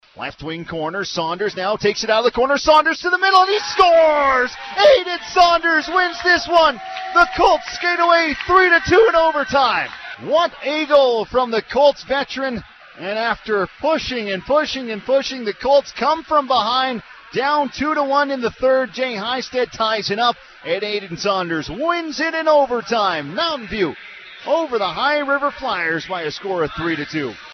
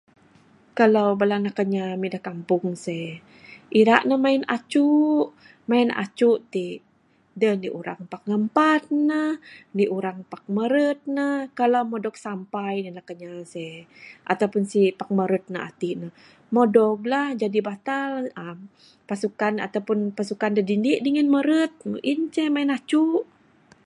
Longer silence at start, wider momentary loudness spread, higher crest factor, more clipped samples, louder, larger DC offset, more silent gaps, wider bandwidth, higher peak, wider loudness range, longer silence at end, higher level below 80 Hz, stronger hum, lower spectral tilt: second, 0.15 s vs 0.75 s; second, 11 LU vs 15 LU; second, 16 dB vs 22 dB; neither; first, -17 LUFS vs -23 LUFS; neither; neither; second, 6.8 kHz vs 11 kHz; about the same, -2 dBFS vs 0 dBFS; about the same, 6 LU vs 5 LU; second, 0 s vs 0.6 s; first, -48 dBFS vs -74 dBFS; neither; second, -3.5 dB/octave vs -6.5 dB/octave